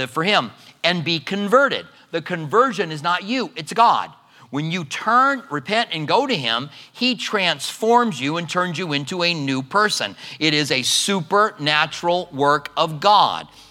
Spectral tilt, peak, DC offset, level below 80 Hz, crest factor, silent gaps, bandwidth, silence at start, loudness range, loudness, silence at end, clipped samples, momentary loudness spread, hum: -3.5 dB/octave; 0 dBFS; under 0.1%; -68 dBFS; 20 dB; none; 16.5 kHz; 0 s; 2 LU; -19 LUFS; 0.25 s; under 0.1%; 9 LU; none